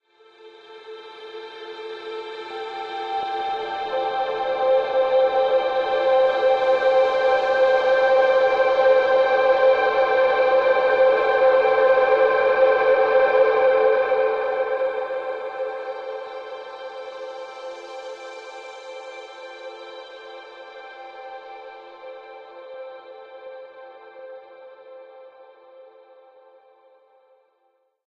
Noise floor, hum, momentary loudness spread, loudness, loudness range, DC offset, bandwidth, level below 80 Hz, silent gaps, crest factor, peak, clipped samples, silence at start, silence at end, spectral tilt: -68 dBFS; none; 23 LU; -19 LUFS; 22 LU; under 0.1%; 6.6 kHz; -64 dBFS; none; 16 dB; -6 dBFS; under 0.1%; 0.45 s; 2.8 s; -3.5 dB/octave